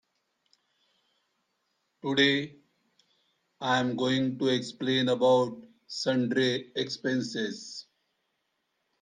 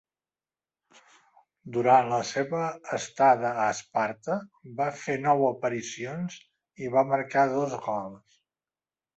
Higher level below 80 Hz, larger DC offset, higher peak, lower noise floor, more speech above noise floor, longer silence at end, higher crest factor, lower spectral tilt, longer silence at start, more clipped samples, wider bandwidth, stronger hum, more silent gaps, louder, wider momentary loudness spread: about the same, -74 dBFS vs -72 dBFS; neither; about the same, -10 dBFS vs -8 dBFS; second, -79 dBFS vs under -90 dBFS; second, 51 dB vs over 63 dB; first, 1.2 s vs 1 s; about the same, 20 dB vs 20 dB; about the same, -5 dB/octave vs -5 dB/octave; first, 2.05 s vs 1.65 s; neither; first, 9.6 kHz vs 8.2 kHz; neither; neither; about the same, -28 LUFS vs -27 LUFS; first, 16 LU vs 13 LU